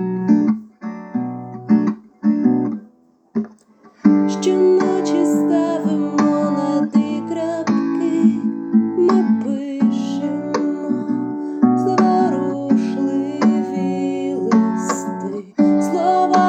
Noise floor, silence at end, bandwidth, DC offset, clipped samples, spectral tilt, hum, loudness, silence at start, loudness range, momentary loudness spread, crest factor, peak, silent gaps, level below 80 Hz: -52 dBFS; 0 s; 9 kHz; under 0.1%; under 0.1%; -7 dB/octave; none; -18 LUFS; 0 s; 3 LU; 10 LU; 18 dB; 0 dBFS; none; -72 dBFS